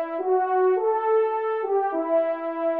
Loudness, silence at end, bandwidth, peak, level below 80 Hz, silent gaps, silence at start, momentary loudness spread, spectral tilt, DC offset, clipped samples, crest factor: -23 LUFS; 0 s; 3.9 kHz; -12 dBFS; -80 dBFS; none; 0 s; 4 LU; -6.5 dB/octave; under 0.1%; under 0.1%; 10 dB